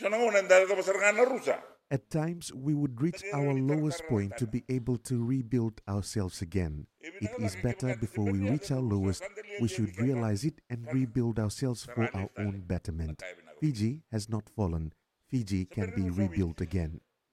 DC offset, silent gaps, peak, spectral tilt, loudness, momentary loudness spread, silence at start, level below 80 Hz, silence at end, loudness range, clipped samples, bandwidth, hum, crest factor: under 0.1%; none; -8 dBFS; -6.5 dB/octave; -31 LUFS; 11 LU; 0 s; -52 dBFS; 0.35 s; 5 LU; under 0.1%; 14.5 kHz; none; 22 dB